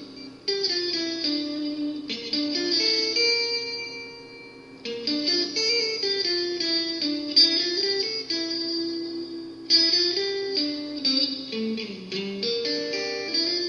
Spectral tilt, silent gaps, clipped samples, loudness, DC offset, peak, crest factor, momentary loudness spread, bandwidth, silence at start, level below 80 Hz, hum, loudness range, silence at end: -2 dB/octave; none; under 0.1%; -23 LUFS; under 0.1%; -6 dBFS; 20 dB; 14 LU; 10.5 kHz; 0 s; -68 dBFS; none; 4 LU; 0 s